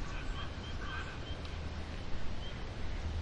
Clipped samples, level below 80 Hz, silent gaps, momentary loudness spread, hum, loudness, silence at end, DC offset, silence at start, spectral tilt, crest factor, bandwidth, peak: under 0.1%; -42 dBFS; none; 2 LU; none; -43 LUFS; 0 s; 0.1%; 0 s; -5.5 dB/octave; 14 dB; 9 kHz; -24 dBFS